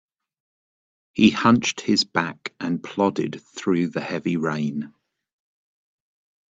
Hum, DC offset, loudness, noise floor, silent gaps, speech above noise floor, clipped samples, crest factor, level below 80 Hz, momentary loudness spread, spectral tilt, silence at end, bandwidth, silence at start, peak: none; under 0.1%; -22 LUFS; under -90 dBFS; none; over 68 dB; under 0.1%; 22 dB; -62 dBFS; 12 LU; -5 dB/octave; 1.6 s; 8 kHz; 1.15 s; -2 dBFS